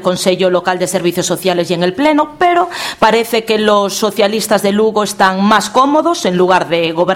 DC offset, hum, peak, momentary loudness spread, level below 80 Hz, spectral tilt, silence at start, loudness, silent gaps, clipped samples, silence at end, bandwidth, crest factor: under 0.1%; none; 0 dBFS; 4 LU; -50 dBFS; -4 dB/octave; 0 s; -12 LUFS; none; under 0.1%; 0 s; 17 kHz; 12 dB